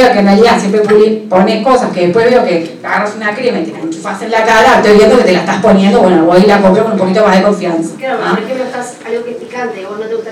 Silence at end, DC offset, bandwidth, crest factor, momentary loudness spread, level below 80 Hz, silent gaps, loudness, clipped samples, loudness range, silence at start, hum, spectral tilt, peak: 0 s; under 0.1%; 13 kHz; 10 dB; 13 LU; -42 dBFS; none; -9 LUFS; 0.7%; 5 LU; 0 s; none; -6 dB/octave; 0 dBFS